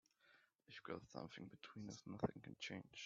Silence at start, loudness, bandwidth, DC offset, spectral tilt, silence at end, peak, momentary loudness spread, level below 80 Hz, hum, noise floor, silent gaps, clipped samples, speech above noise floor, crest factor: 0.25 s; -52 LUFS; 7.4 kHz; under 0.1%; -4.5 dB/octave; 0 s; -30 dBFS; 10 LU; -76 dBFS; none; -76 dBFS; none; under 0.1%; 24 dB; 24 dB